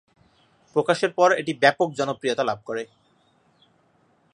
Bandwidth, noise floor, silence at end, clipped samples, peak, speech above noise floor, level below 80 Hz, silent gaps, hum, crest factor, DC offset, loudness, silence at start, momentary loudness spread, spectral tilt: 11 kHz; -63 dBFS; 1.5 s; under 0.1%; -2 dBFS; 41 dB; -72 dBFS; none; none; 22 dB; under 0.1%; -23 LUFS; 0.75 s; 12 LU; -4.5 dB/octave